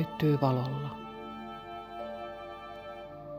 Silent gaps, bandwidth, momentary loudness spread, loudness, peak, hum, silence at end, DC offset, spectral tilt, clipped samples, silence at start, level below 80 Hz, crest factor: none; 15.5 kHz; 16 LU; -35 LUFS; -12 dBFS; none; 0 s; under 0.1%; -8.5 dB/octave; under 0.1%; 0 s; -62 dBFS; 22 dB